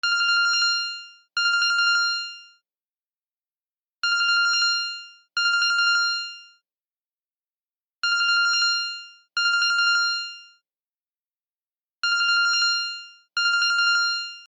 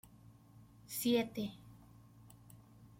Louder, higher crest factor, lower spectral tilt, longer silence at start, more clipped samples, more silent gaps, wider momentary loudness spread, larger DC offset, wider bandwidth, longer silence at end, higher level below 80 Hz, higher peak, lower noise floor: first, -21 LUFS vs -37 LUFS; second, 14 dB vs 20 dB; second, 5.5 dB/octave vs -4.5 dB/octave; second, 0.05 s vs 0.6 s; neither; first, 2.89-3.07 s, 3.13-3.94 s, 6.80-7.83 s, 7.94-8.02 s, 10.96-11.32 s, 11.41-11.69 s, 11.75-11.80 s, 11.90-11.96 s vs none; second, 11 LU vs 27 LU; neither; second, 10.5 kHz vs 16.5 kHz; about the same, 0.05 s vs 0.15 s; second, -86 dBFS vs -70 dBFS; first, -10 dBFS vs -22 dBFS; first, under -90 dBFS vs -61 dBFS